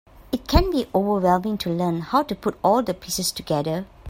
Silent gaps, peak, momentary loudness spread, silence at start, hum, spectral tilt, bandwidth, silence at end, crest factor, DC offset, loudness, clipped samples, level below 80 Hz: none; -2 dBFS; 6 LU; 0.2 s; none; -5.5 dB/octave; 16.5 kHz; 0 s; 20 dB; under 0.1%; -23 LUFS; under 0.1%; -34 dBFS